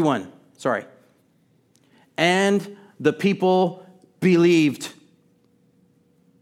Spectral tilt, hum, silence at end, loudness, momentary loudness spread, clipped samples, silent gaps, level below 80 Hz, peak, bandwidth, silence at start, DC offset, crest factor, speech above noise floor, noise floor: -6 dB/octave; none; 1.5 s; -21 LUFS; 18 LU; under 0.1%; none; -74 dBFS; -2 dBFS; 14.5 kHz; 0 s; under 0.1%; 20 dB; 42 dB; -62 dBFS